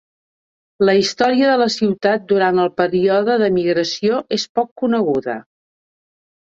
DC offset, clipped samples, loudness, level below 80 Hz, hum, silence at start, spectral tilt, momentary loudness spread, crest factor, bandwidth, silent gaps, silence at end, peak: under 0.1%; under 0.1%; -17 LUFS; -60 dBFS; none; 0.8 s; -5 dB/octave; 5 LU; 16 dB; 7.8 kHz; 4.49-4.55 s, 4.71-4.76 s; 1.1 s; -2 dBFS